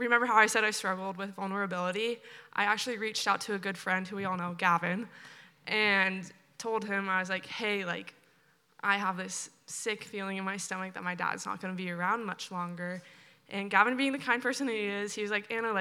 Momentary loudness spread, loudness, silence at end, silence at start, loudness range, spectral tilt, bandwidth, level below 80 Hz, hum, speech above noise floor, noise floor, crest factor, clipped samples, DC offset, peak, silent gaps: 13 LU; -31 LUFS; 0 s; 0 s; 5 LU; -3.5 dB/octave; 16.5 kHz; under -90 dBFS; none; 36 dB; -67 dBFS; 24 dB; under 0.1%; under 0.1%; -8 dBFS; none